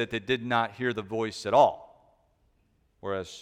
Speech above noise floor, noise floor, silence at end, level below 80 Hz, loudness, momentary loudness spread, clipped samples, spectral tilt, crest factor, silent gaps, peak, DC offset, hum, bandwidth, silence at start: 41 dB; -69 dBFS; 0 s; -64 dBFS; -27 LUFS; 13 LU; under 0.1%; -5 dB/octave; 20 dB; none; -8 dBFS; under 0.1%; none; 13 kHz; 0 s